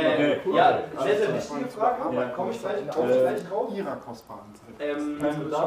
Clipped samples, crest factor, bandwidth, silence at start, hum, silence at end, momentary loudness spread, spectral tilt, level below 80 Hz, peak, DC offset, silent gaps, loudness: under 0.1%; 18 dB; 15.5 kHz; 0 s; none; 0 s; 13 LU; -6 dB/octave; -64 dBFS; -8 dBFS; under 0.1%; none; -26 LUFS